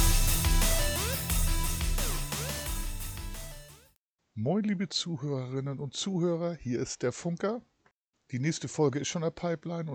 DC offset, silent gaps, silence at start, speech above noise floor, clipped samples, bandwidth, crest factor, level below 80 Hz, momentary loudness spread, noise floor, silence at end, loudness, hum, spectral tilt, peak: under 0.1%; 3.98-4.16 s, 7.91-8.10 s; 0 s; 40 dB; under 0.1%; 19.5 kHz; 18 dB; -34 dBFS; 12 LU; -71 dBFS; 0 s; -31 LUFS; none; -4 dB/octave; -14 dBFS